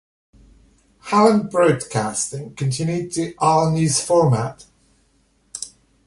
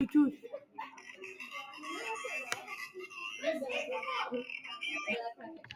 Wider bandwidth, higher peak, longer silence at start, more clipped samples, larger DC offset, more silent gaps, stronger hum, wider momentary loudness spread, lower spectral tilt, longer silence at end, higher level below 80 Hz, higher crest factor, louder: second, 11.5 kHz vs 14.5 kHz; first, -2 dBFS vs -14 dBFS; first, 1.05 s vs 0 s; neither; neither; neither; neither; first, 16 LU vs 13 LU; first, -5.5 dB/octave vs -3 dB/octave; first, 0.4 s vs 0 s; first, -54 dBFS vs -84 dBFS; about the same, 18 dB vs 22 dB; first, -19 LUFS vs -38 LUFS